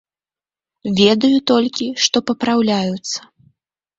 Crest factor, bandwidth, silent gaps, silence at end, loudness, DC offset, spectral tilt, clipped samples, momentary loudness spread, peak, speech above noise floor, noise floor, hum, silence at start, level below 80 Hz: 18 dB; 8 kHz; none; 0.8 s; -16 LUFS; under 0.1%; -4 dB/octave; under 0.1%; 12 LU; 0 dBFS; over 74 dB; under -90 dBFS; none; 0.85 s; -58 dBFS